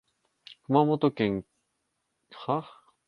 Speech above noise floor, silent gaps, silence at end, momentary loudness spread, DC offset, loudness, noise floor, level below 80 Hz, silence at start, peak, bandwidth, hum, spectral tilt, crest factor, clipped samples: 53 dB; none; 0.45 s; 14 LU; under 0.1%; -27 LUFS; -79 dBFS; -64 dBFS; 0.5 s; -8 dBFS; 5.6 kHz; none; -9 dB/octave; 22 dB; under 0.1%